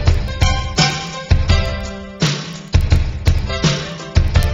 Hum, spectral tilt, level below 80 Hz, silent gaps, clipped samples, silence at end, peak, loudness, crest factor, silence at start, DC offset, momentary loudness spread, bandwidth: none; -5 dB/octave; -20 dBFS; none; under 0.1%; 0 s; 0 dBFS; -18 LUFS; 16 dB; 0 s; under 0.1%; 7 LU; 13 kHz